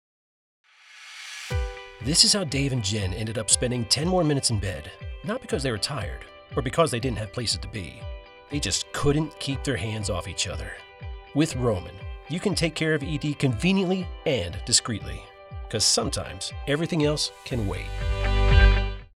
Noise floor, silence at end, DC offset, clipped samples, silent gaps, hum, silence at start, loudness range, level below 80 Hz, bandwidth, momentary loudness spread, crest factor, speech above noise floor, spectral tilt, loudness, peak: -47 dBFS; 0.1 s; under 0.1%; under 0.1%; none; none; 0.95 s; 5 LU; -32 dBFS; 14.5 kHz; 17 LU; 24 dB; 22 dB; -4 dB/octave; -25 LUFS; -2 dBFS